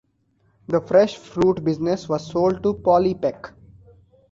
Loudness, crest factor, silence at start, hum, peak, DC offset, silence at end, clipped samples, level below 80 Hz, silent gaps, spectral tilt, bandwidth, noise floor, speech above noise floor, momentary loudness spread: -21 LUFS; 18 dB; 0.7 s; none; -4 dBFS; under 0.1%; 0.8 s; under 0.1%; -52 dBFS; none; -7 dB/octave; 7.6 kHz; -64 dBFS; 44 dB; 8 LU